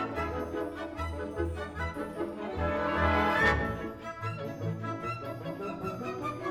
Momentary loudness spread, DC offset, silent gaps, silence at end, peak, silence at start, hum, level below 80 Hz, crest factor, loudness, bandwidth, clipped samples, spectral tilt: 11 LU; under 0.1%; none; 0 s; -12 dBFS; 0 s; none; -46 dBFS; 22 dB; -33 LUFS; 14.5 kHz; under 0.1%; -6.5 dB/octave